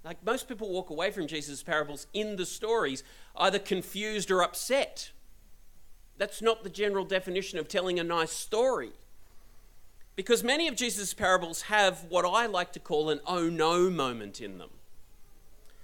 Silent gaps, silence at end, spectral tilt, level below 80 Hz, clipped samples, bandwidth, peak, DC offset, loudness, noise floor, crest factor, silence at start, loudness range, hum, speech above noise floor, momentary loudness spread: none; 0 s; -3 dB/octave; -56 dBFS; under 0.1%; 17.5 kHz; -10 dBFS; under 0.1%; -30 LUFS; -51 dBFS; 22 dB; 0 s; 5 LU; none; 21 dB; 10 LU